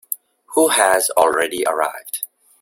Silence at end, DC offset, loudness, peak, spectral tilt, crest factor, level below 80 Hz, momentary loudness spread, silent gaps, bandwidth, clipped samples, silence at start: 0.35 s; under 0.1%; -17 LUFS; 0 dBFS; -1 dB/octave; 18 dB; -62 dBFS; 14 LU; none; 17 kHz; under 0.1%; 0.1 s